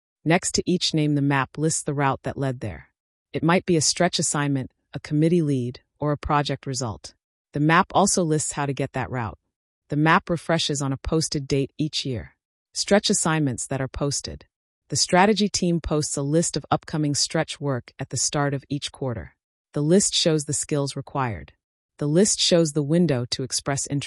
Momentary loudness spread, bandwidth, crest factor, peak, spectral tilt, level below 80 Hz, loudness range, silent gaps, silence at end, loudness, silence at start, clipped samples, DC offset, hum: 12 LU; 12 kHz; 18 dB; -6 dBFS; -4 dB/octave; -48 dBFS; 2 LU; 3.00-3.26 s, 7.24-7.45 s, 9.56-9.82 s, 12.45-12.65 s, 14.56-14.82 s, 19.44-19.65 s, 21.64-21.89 s; 0 s; -23 LUFS; 0.25 s; under 0.1%; under 0.1%; none